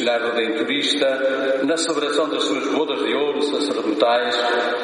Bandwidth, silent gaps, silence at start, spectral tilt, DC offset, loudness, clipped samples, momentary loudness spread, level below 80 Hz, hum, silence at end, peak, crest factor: 10.5 kHz; none; 0 s; -2.5 dB/octave; under 0.1%; -20 LUFS; under 0.1%; 3 LU; -76 dBFS; none; 0 s; -4 dBFS; 16 dB